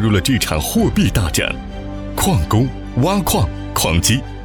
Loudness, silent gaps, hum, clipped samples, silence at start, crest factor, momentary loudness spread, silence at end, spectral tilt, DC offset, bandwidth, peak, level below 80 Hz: -17 LUFS; none; none; under 0.1%; 0 s; 14 dB; 7 LU; 0 s; -4.5 dB/octave; under 0.1%; 20 kHz; -2 dBFS; -28 dBFS